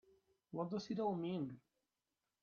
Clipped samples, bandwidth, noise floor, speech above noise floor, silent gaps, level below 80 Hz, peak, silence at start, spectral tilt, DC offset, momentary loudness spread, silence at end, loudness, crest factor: under 0.1%; 7 kHz; under -90 dBFS; over 48 dB; none; -82 dBFS; -28 dBFS; 0.5 s; -7 dB/octave; under 0.1%; 10 LU; 0.85 s; -43 LUFS; 18 dB